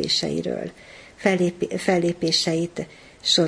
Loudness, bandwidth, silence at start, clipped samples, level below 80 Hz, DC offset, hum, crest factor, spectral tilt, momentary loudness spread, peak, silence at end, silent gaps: -23 LUFS; 10.5 kHz; 0 s; under 0.1%; -56 dBFS; under 0.1%; none; 20 dB; -4 dB/octave; 16 LU; -4 dBFS; 0 s; none